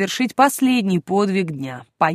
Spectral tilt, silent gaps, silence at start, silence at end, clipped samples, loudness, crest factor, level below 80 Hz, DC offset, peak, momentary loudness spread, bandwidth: -5 dB/octave; none; 0 s; 0 s; under 0.1%; -19 LUFS; 18 dB; -64 dBFS; under 0.1%; 0 dBFS; 11 LU; 15.5 kHz